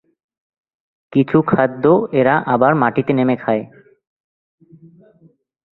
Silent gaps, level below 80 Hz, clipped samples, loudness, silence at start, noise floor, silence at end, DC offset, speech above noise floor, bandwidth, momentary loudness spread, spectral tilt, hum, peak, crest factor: none; -56 dBFS; under 0.1%; -16 LUFS; 1.1 s; -53 dBFS; 2.15 s; under 0.1%; 38 dB; 4.2 kHz; 6 LU; -11 dB/octave; none; 0 dBFS; 18 dB